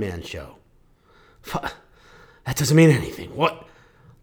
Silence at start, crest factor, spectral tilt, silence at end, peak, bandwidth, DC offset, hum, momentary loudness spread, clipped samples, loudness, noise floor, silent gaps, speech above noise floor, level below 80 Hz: 0 s; 20 dB; -6 dB/octave; 0.6 s; -4 dBFS; 20 kHz; under 0.1%; none; 24 LU; under 0.1%; -21 LUFS; -57 dBFS; none; 36 dB; -48 dBFS